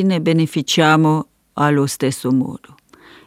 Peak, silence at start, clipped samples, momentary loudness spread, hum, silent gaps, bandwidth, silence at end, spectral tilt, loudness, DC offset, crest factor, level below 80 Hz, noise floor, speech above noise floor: 0 dBFS; 0 s; under 0.1%; 11 LU; none; none; 16 kHz; 0.7 s; -5.5 dB/octave; -17 LUFS; under 0.1%; 18 dB; -64 dBFS; -46 dBFS; 30 dB